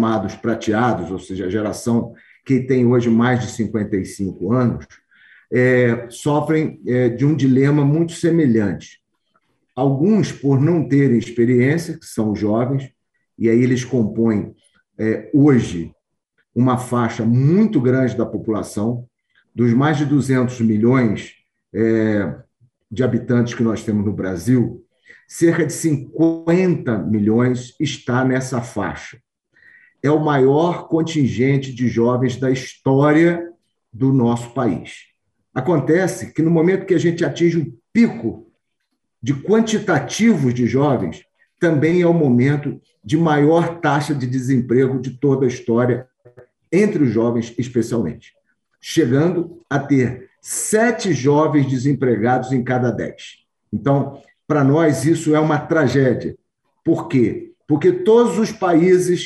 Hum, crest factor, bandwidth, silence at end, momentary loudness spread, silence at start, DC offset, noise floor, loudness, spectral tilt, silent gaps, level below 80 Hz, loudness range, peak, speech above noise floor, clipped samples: none; 16 dB; 12.5 kHz; 0 s; 10 LU; 0 s; under 0.1%; -74 dBFS; -18 LUFS; -7 dB/octave; none; -54 dBFS; 3 LU; -2 dBFS; 58 dB; under 0.1%